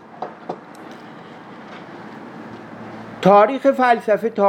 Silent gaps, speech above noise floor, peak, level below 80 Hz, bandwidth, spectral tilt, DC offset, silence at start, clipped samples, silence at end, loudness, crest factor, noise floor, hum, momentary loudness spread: none; 24 dB; -2 dBFS; -70 dBFS; 13 kHz; -7 dB/octave; under 0.1%; 0.2 s; under 0.1%; 0 s; -15 LUFS; 18 dB; -38 dBFS; none; 25 LU